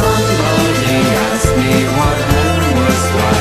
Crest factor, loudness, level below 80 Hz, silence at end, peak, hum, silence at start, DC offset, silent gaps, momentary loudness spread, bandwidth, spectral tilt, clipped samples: 12 dB; -13 LUFS; -26 dBFS; 0 s; 0 dBFS; none; 0 s; under 0.1%; none; 1 LU; 15 kHz; -5 dB/octave; under 0.1%